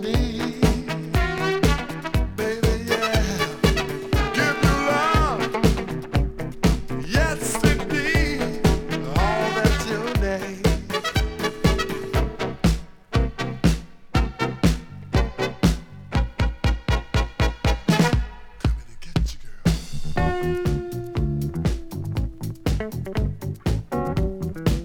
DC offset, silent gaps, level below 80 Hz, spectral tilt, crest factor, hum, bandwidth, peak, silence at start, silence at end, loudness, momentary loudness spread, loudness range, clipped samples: under 0.1%; none; -28 dBFS; -5.5 dB/octave; 20 dB; none; 18.5 kHz; -4 dBFS; 0 s; 0 s; -24 LUFS; 7 LU; 5 LU; under 0.1%